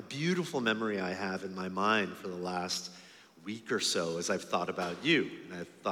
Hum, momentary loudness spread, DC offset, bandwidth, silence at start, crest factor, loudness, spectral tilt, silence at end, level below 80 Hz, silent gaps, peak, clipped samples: none; 14 LU; under 0.1%; 17 kHz; 0 s; 22 dB; -33 LUFS; -3.5 dB/octave; 0 s; -80 dBFS; none; -12 dBFS; under 0.1%